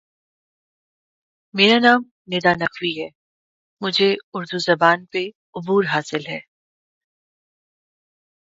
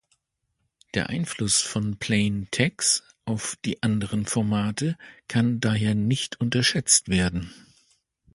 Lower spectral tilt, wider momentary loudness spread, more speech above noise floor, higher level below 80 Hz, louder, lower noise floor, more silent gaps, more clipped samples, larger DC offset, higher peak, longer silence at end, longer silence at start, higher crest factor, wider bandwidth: about the same, -4.5 dB/octave vs -3.5 dB/octave; first, 16 LU vs 10 LU; first, over 71 dB vs 52 dB; second, -66 dBFS vs -50 dBFS; first, -19 LUFS vs -24 LUFS; first, under -90 dBFS vs -77 dBFS; first, 2.11-2.25 s, 3.15-3.77 s, 4.23-4.32 s, 5.35-5.53 s vs none; neither; neither; first, 0 dBFS vs -4 dBFS; first, 2.15 s vs 0.8 s; first, 1.55 s vs 0.95 s; about the same, 22 dB vs 22 dB; second, 7.8 kHz vs 11.5 kHz